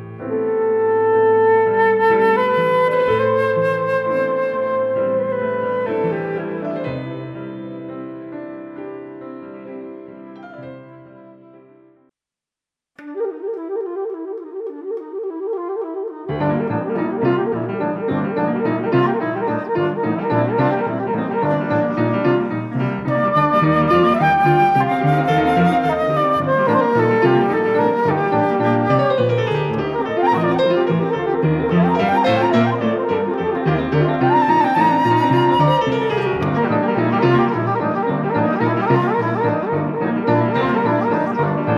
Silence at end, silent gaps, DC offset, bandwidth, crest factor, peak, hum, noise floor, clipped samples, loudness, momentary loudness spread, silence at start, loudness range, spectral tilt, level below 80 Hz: 0 s; none; under 0.1%; 12 kHz; 16 dB; -2 dBFS; none; -88 dBFS; under 0.1%; -18 LUFS; 14 LU; 0 s; 14 LU; -8.5 dB/octave; -50 dBFS